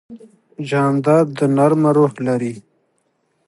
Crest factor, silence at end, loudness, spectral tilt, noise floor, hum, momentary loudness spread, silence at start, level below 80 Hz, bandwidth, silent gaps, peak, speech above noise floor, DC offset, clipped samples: 16 dB; 0.9 s; -16 LUFS; -8 dB/octave; -66 dBFS; none; 12 LU; 0.1 s; -66 dBFS; 11.5 kHz; none; -2 dBFS; 50 dB; under 0.1%; under 0.1%